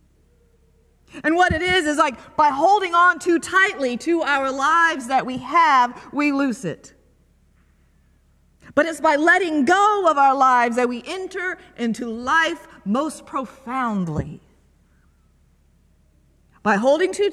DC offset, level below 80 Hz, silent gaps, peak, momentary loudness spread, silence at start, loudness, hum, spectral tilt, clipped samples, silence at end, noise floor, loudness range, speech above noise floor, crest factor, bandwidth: under 0.1%; -50 dBFS; none; -4 dBFS; 12 LU; 1.15 s; -19 LUFS; none; -4.5 dB/octave; under 0.1%; 0 s; -58 dBFS; 9 LU; 39 dB; 18 dB; 13.5 kHz